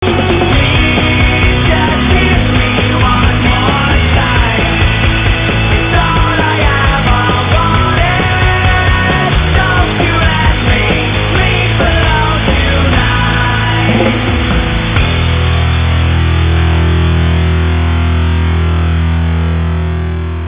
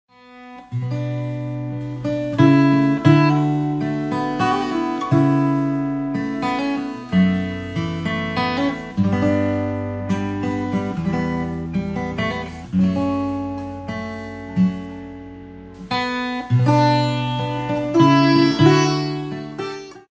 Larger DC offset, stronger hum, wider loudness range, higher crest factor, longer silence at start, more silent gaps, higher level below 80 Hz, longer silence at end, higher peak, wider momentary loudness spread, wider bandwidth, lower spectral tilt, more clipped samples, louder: neither; neither; second, 2 LU vs 7 LU; second, 10 dB vs 18 dB; second, 0 s vs 0.3 s; neither; first, -14 dBFS vs -44 dBFS; about the same, 0 s vs 0.1 s; about the same, 0 dBFS vs -2 dBFS; second, 3 LU vs 14 LU; second, 4 kHz vs 8 kHz; first, -10 dB/octave vs -7 dB/octave; neither; first, -10 LUFS vs -20 LUFS